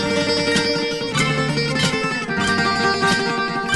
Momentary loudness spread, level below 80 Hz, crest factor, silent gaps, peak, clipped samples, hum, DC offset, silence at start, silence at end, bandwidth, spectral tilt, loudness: 4 LU; -46 dBFS; 16 dB; none; -4 dBFS; under 0.1%; none; 0.2%; 0 s; 0 s; 11.5 kHz; -4 dB/octave; -19 LUFS